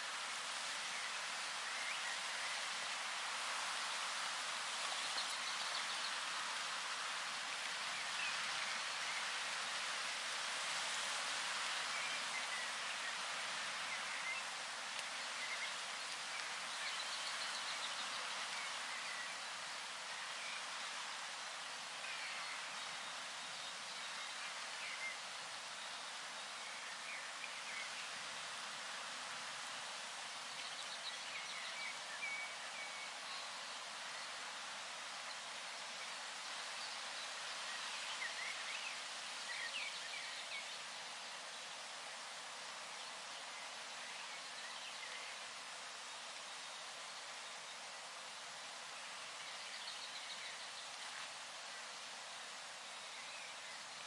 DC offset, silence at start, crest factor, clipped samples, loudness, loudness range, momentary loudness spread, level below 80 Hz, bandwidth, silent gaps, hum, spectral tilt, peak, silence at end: under 0.1%; 0 s; 22 dB; under 0.1%; -43 LUFS; 7 LU; 8 LU; under -90 dBFS; 11.5 kHz; none; none; 1.5 dB/octave; -24 dBFS; 0 s